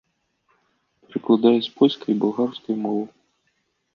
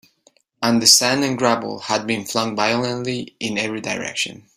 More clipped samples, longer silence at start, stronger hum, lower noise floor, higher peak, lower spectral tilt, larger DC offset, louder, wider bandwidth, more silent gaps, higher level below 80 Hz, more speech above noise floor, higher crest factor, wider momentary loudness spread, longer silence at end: neither; first, 1.15 s vs 0.6 s; neither; first, -71 dBFS vs -59 dBFS; second, -4 dBFS vs 0 dBFS; first, -8 dB/octave vs -2.5 dB/octave; neither; about the same, -21 LUFS vs -19 LUFS; second, 6.6 kHz vs 16 kHz; neither; second, -72 dBFS vs -60 dBFS; first, 51 dB vs 39 dB; about the same, 20 dB vs 20 dB; about the same, 13 LU vs 13 LU; first, 0.85 s vs 0.25 s